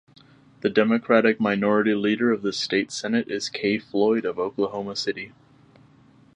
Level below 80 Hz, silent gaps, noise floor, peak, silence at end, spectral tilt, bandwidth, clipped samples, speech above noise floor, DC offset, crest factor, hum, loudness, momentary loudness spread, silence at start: -66 dBFS; none; -54 dBFS; -4 dBFS; 1.1 s; -5 dB/octave; 10 kHz; under 0.1%; 32 dB; under 0.1%; 20 dB; none; -23 LUFS; 9 LU; 0.65 s